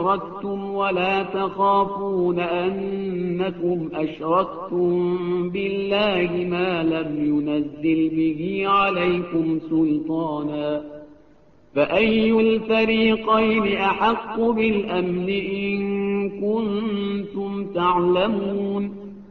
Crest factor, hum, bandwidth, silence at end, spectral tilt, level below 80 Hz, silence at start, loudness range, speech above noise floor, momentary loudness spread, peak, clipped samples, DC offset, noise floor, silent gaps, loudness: 16 dB; none; 5.8 kHz; 0.05 s; -8.5 dB/octave; -52 dBFS; 0 s; 4 LU; 33 dB; 8 LU; -6 dBFS; under 0.1%; 0.2%; -54 dBFS; none; -22 LUFS